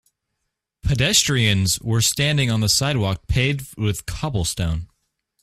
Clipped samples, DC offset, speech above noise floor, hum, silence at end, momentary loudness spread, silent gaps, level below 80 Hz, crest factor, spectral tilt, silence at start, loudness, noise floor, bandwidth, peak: under 0.1%; under 0.1%; 58 dB; none; 0.55 s; 10 LU; none; -36 dBFS; 18 dB; -3.5 dB/octave; 0.85 s; -20 LUFS; -78 dBFS; 16 kHz; -4 dBFS